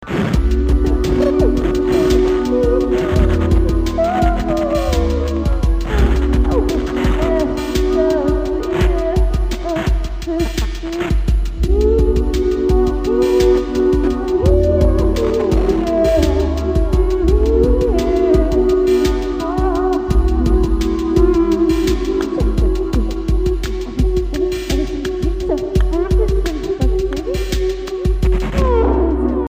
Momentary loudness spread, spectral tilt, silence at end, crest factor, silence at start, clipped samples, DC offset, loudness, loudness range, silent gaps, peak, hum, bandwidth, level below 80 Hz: 6 LU; -7.5 dB/octave; 0 s; 14 dB; 0 s; under 0.1%; under 0.1%; -16 LUFS; 4 LU; none; 0 dBFS; none; 15.5 kHz; -18 dBFS